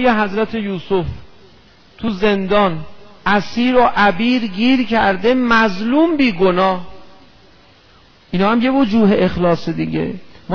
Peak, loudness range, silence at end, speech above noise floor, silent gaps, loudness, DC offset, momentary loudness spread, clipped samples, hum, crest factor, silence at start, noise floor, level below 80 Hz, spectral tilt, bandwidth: -2 dBFS; 4 LU; 0 s; 33 dB; none; -16 LUFS; under 0.1%; 11 LU; under 0.1%; none; 14 dB; 0 s; -48 dBFS; -40 dBFS; -7 dB/octave; 5.4 kHz